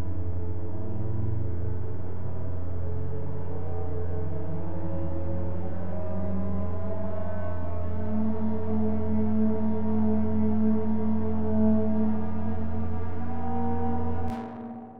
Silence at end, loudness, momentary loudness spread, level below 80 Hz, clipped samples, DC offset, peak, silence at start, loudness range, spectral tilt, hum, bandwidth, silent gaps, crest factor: 0 s; -30 LUFS; 9 LU; -44 dBFS; under 0.1%; 7%; -12 dBFS; 0 s; 7 LU; -11.5 dB/octave; none; 3.7 kHz; none; 14 dB